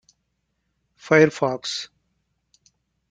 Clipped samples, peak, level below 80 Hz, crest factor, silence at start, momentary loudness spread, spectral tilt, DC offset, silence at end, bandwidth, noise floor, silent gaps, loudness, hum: under 0.1%; -2 dBFS; -64 dBFS; 24 dB; 1.05 s; 14 LU; -5 dB/octave; under 0.1%; 1.25 s; 9.4 kHz; -74 dBFS; none; -20 LUFS; none